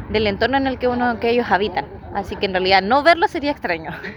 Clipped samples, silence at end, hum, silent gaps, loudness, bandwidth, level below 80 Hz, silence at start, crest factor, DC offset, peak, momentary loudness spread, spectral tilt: under 0.1%; 0 s; none; none; -18 LUFS; over 20 kHz; -42 dBFS; 0 s; 18 dB; under 0.1%; 0 dBFS; 11 LU; -6 dB/octave